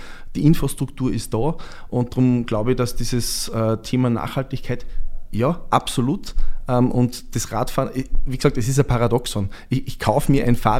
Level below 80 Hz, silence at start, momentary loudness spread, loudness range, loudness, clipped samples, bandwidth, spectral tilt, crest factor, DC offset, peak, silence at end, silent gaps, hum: -28 dBFS; 0 s; 10 LU; 2 LU; -22 LUFS; under 0.1%; 15.5 kHz; -6 dB/octave; 18 dB; under 0.1%; 0 dBFS; 0 s; none; none